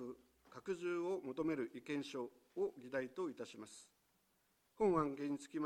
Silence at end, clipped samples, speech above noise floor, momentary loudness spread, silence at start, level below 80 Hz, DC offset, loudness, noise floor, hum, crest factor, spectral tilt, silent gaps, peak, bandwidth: 0 s; under 0.1%; 37 dB; 17 LU; 0 s; -74 dBFS; under 0.1%; -42 LUFS; -79 dBFS; none; 20 dB; -6 dB/octave; none; -24 dBFS; 15 kHz